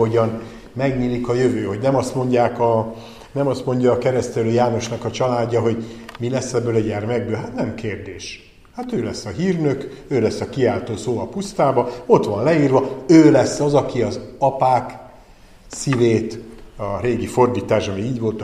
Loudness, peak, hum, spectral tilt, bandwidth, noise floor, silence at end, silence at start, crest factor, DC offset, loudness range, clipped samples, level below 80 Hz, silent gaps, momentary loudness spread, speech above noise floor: -19 LUFS; 0 dBFS; none; -6.5 dB/octave; 13 kHz; -45 dBFS; 0 s; 0 s; 18 dB; 0.1%; 8 LU; under 0.1%; -46 dBFS; none; 13 LU; 27 dB